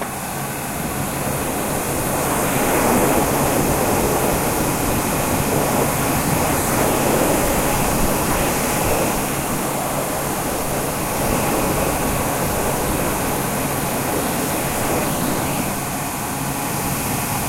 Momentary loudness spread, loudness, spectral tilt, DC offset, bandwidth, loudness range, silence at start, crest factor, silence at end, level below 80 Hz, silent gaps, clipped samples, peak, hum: 5 LU; -19 LUFS; -4 dB/octave; under 0.1%; 16 kHz; 3 LU; 0 s; 16 dB; 0 s; -34 dBFS; none; under 0.1%; -2 dBFS; none